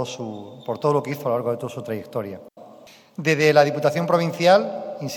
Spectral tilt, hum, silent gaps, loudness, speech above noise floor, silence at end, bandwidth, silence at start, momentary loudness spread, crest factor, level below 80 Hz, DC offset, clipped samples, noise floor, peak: -5.5 dB/octave; none; none; -21 LUFS; 26 dB; 0 s; 19 kHz; 0 s; 17 LU; 20 dB; -74 dBFS; under 0.1%; under 0.1%; -47 dBFS; -2 dBFS